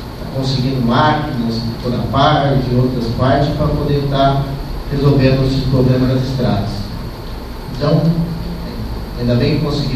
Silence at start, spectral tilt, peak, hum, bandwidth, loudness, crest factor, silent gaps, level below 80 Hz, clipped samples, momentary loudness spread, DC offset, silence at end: 0 s; -7.5 dB/octave; 0 dBFS; none; 14 kHz; -16 LUFS; 16 dB; none; -28 dBFS; under 0.1%; 12 LU; under 0.1%; 0 s